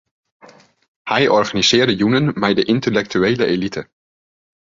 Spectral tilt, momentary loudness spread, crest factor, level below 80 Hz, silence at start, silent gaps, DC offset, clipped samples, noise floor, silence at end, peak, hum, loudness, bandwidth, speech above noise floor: -4.5 dB/octave; 8 LU; 16 dB; -52 dBFS; 1.05 s; none; under 0.1%; under 0.1%; under -90 dBFS; 0.85 s; -2 dBFS; none; -16 LUFS; 7.8 kHz; over 74 dB